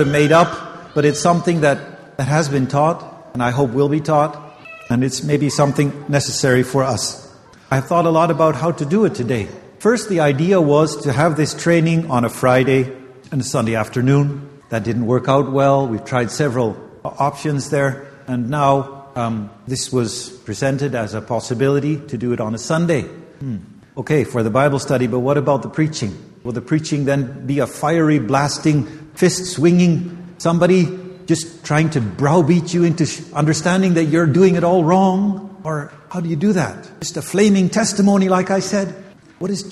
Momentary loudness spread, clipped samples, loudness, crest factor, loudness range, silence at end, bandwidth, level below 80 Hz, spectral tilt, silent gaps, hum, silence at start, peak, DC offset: 12 LU; under 0.1%; -17 LUFS; 16 dB; 5 LU; 0 s; 13 kHz; -50 dBFS; -6 dB/octave; none; none; 0 s; 0 dBFS; under 0.1%